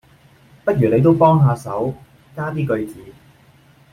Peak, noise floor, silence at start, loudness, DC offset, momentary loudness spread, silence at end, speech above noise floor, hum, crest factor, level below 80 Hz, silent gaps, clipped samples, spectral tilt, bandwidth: -2 dBFS; -50 dBFS; 0.65 s; -17 LUFS; under 0.1%; 17 LU; 0.8 s; 34 dB; none; 16 dB; -52 dBFS; none; under 0.1%; -9 dB/octave; 13.5 kHz